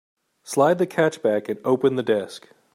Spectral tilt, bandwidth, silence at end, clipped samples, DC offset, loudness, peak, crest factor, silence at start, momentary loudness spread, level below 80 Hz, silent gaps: -5.5 dB/octave; 16 kHz; 0.35 s; under 0.1%; under 0.1%; -22 LUFS; -6 dBFS; 18 dB; 0.45 s; 8 LU; -72 dBFS; none